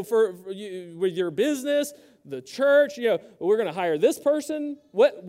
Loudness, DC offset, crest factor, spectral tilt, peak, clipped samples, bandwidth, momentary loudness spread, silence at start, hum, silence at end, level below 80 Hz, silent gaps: -24 LUFS; under 0.1%; 16 dB; -4.5 dB/octave; -8 dBFS; under 0.1%; 16 kHz; 15 LU; 0 s; none; 0 s; -78 dBFS; none